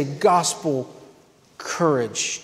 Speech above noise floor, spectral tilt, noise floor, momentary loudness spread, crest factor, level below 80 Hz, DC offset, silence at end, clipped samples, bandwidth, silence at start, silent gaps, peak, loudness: 32 dB; -3.5 dB/octave; -53 dBFS; 15 LU; 18 dB; -68 dBFS; under 0.1%; 0 s; under 0.1%; 16 kHz; 0 s; none; -6 dBFS; -22 LUFS